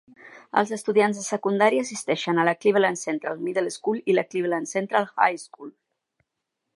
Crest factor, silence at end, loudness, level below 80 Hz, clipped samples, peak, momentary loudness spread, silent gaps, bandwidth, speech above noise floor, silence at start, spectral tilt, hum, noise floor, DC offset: 20 dB; 1.05 s; -24 LUFS; -80 dBFS; under 0.1%; -4 dBFS; 8 LU; none; 11.5 kHz; 58 dB; 0.25 s; -4.5 dB/octave; none; -82 dBFS; under 0.1%